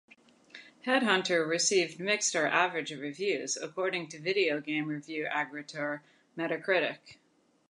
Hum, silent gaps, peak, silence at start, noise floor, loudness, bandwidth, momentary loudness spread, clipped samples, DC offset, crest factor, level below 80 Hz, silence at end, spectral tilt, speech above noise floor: none; none; -10 dBFS; 0.55 s; -55 dBFS; -30 LUFS; 11 kHz; 11 LU; under 0.1%; under 0.1%; 22 dB; -84 dBFS; 0.55 s; -2.5 dB/octave; 24 dB